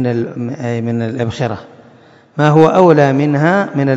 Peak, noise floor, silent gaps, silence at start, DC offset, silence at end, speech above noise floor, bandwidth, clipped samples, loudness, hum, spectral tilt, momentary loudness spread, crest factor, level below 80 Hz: 0 dBFS; -44 dBFS; none; 0 s; under 0.1%; 0 s; 32 dB; 7.8 kHz; 0.5%; -13 LUFS; none; -8 dB/octave; 13 LU; 14 dB; -54 dBFS